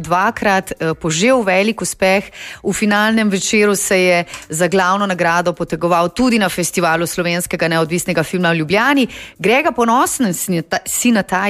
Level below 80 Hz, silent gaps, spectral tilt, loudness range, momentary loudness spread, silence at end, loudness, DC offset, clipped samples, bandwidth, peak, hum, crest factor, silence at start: -46 dBFS; none; -4 dB/octave; 1 LU; 6 LU; 0 s; -15 LUFS; under 0.1%; under 0.1%; 15.5 kHz; -2 dBFS; none; 14 dB; 0 s